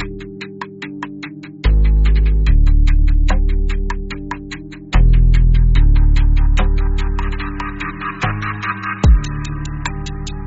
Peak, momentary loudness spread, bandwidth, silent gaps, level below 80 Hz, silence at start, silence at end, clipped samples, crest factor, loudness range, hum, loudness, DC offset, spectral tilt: -2 dBFS; 14 LU; 7.8 kHz; none; -14 dBFS; 0 s; 0 s; under 0.1%; 12 dB; 3 LU; none; -18 LUFS; under 0.1%; -6 dB/octave